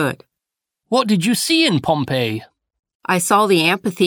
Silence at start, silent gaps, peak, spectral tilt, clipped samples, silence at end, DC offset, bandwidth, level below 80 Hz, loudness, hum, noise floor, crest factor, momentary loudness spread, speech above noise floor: 0 s; 2.79-2.83 s, 2.95-3.00 s; -4 dBFS; -4 dB/octave; under 0.1%; 0 s; under 0.1%; over 20 kHz; -58 dBFS; -17 LUFS; none; -84 dBFS; 16 dB; 10 LU; 67 dB